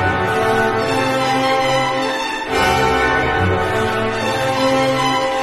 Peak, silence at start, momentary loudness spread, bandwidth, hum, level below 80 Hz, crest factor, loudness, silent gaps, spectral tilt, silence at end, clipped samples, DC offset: -2 dBFS; 0 s; 4 LU; 13 kHz; none; -38 dBFS; 14 dB; -16 LUFS; none; -4.5 dB/octave; 0 s; under 0.1%; under 0.1%